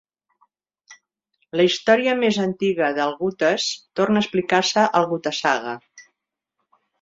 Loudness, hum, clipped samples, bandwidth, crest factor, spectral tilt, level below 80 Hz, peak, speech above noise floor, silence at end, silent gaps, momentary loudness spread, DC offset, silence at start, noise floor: -20 LUFS; none; under 0.1%; 7.8 kHz; 20 dB; -4 dB/octave; -66 dBFS; -2 dBFS; 59 dB; 1 s; none; 7 LU; under 0.1%; 0.9 s; -79 dBFS